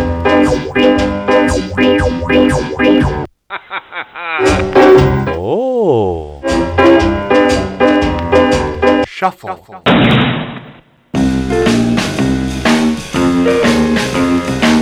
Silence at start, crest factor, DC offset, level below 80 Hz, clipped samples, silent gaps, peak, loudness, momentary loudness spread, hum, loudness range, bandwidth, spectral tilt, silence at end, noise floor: 0 s; 12 dB; under 0.1%; -28 dBFS; 0.1%; none; 0 dBFS; -12 LUFS; 12 LU; none; 3 LU; over 20 kHz; -6 dB/octave; 0 s; -39 dBFS